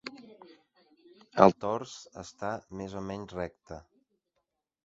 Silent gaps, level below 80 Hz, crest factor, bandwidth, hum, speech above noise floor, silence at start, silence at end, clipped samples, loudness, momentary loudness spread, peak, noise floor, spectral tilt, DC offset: none; -62 dBFS; 30 dB; 8 kHz; none; 52 dB; 0.05 s; 1.05 s; under 0.1%; -30 LUFS; 25 LU; -2 dBFS; -82 dBFS; -5.5 dB/octave; under 0.1%